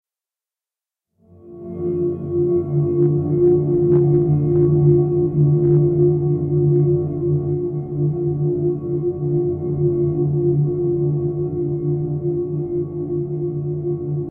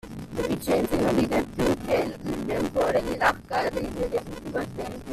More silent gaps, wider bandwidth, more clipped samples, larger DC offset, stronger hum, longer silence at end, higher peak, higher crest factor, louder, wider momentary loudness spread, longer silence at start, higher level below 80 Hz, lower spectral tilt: neither; second, 1.6 kHz vs 15 kHz; neither; neither; neither; about the same, 0 s vs 0 s; first, -4 dBFS vs -8 dBFS; about the same, 14 dB vs 18 dB; first, -19 LUFS vs -26 LUFS; about the same, 9 LU vs 8 LU; first, 1.45 s vs 0.05 s; about the same, -46 dBFS vs -44 dBFS; first, -15.5 dB/octave vs -5.5 dB/octave